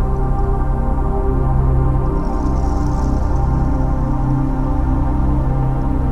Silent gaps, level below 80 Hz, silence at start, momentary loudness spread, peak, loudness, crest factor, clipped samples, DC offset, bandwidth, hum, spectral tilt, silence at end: none; -18 dBFS; 0 s; 3 LU; -4 dBFS; -19 LUFS; 12 dB; under 0.1%; under 0.1%; 6.8 kHz; none; -9.5 dB/octave; 0 s